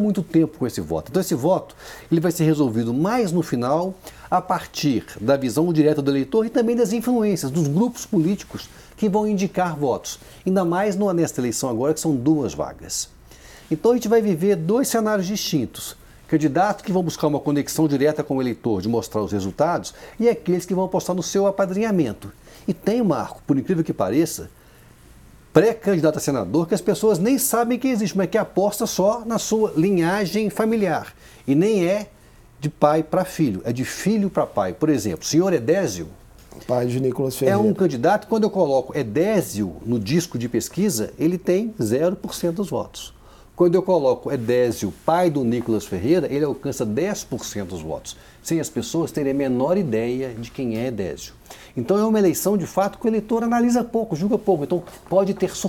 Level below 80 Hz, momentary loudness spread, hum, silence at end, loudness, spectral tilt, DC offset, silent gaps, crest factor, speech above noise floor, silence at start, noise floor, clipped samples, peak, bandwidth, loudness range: -52 dBFS; 9 LU; none; 0 s; -21 LUFS; -6 dB/octave; under 0.1%; none; 22 dB; 28 dB; 0 s; -48 dBFS; under 0.1%; 0 dBFS; 18 kHz; 3 LU